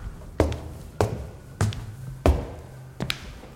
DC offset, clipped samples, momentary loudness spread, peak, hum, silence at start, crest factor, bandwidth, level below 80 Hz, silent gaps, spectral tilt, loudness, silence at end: under 0.1%; under 0.1%; 16 LU; -4 dBFS; none; 0 s; 24 dB; 16.5 kHz; -34 dBFS; none; -6 dB/octave; -28 LUFS; 0 s